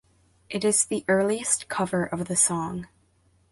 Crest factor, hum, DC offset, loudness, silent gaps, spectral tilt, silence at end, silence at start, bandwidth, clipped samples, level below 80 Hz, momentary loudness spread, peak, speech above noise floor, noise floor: 20 dB; none; under 0.1%; -24 LUFS; none; -3.5 dB/octave; 0.65 s; 0.5 s; 12 kHz; under 0.1%; -60 dBFS; 10 LU; -8 dBFS; 39 dB; -64 dBFS